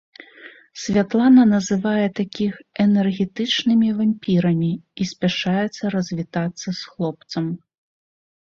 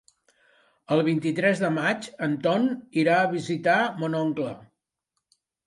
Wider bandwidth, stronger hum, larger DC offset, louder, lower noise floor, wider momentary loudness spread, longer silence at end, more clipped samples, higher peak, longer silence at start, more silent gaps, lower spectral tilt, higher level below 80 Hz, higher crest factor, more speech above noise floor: second, 7.4 kHz vs 11.5 kHz; neither; neither; first, -20 LUFS vs -25 LUFS; second, -45 dBFS vs -81 dBFS; first, 12 LU vs 7 LU; second, 0.9 s vs 1.05 s; neither; first, -4 dBFS vs -8 dBFS; second, 0.4 s vs 0.9 s; neither; about the same, -6 dB/octave vs -6 dB/octave; first, -58 dBFS vs -72 dBFS; about the same, 16 dB vs 18 dB; second, 26 dB vs 57 dB